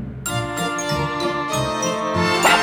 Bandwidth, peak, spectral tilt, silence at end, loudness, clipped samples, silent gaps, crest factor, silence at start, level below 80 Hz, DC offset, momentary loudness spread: over 20 kHz; -2 dBFS; -3.5 dB/octave; 0 s; -21 LUFS; under 0.1%; none; 18 dB; 0 s; -42 dBFS; under 0.1%; 7 LU